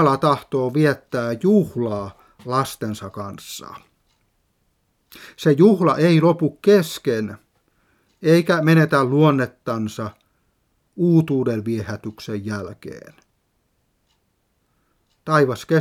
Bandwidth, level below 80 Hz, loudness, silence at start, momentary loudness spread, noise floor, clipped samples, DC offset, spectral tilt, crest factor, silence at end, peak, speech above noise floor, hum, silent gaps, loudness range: 15.5 kHz; -62 dBFS; -19 LUFS; 0 s; 18 LU; -68 dBFS; under 0.1%; under 0.1%; -7 dB/octave; 18 dB; 0 s; -2 dBFS; 49 dB; none; none; 12 LU